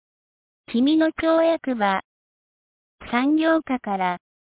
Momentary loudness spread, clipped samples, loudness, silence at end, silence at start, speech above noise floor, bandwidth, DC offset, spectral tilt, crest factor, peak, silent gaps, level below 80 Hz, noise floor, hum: 8 LU; under 0.1%; -22 LUFS; 0.4 s; 0.7 s; over 69 dB; 4 kHz; under 0.1%; -9.5 dB/octave; 16 dB; -8 dBFS; 2.04-2.98 s; -58 dBFS; under -90 dBFS; none